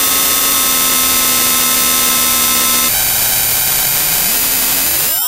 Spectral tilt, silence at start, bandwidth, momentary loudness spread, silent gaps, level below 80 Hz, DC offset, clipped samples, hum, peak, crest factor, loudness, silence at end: 0 dB/octave; 0 s; over 20 kHz; 1 LU; none; -38 dBFS; under 0.1%; 0.3%; none; 0 dBFS; 12 dB; -10 LUFS; 0 s